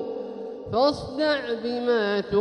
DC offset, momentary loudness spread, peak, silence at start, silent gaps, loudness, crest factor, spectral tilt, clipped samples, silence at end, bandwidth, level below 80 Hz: under 0.1%; 11 LU; -10 dBFS; 0 s; none; -25 LUFS; 16 dB; -5.5 dB/octave; under 0.1%; 0 s; 10.5 kHz; -54 dBFS